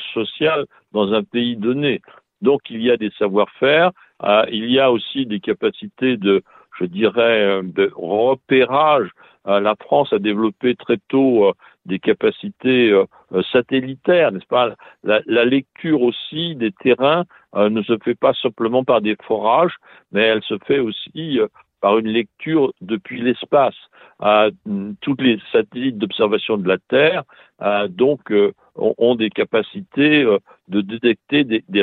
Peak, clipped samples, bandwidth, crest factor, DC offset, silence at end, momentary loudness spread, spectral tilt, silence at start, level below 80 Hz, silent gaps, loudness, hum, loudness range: -2 dBFS; under 0.1%; 4.3 kHz; 16 dB; under 0.1%; 0 s; 8 LU; -9 dB/octave; 0 s; -62 dBFS; none; -18 LUFS; none; 2 LU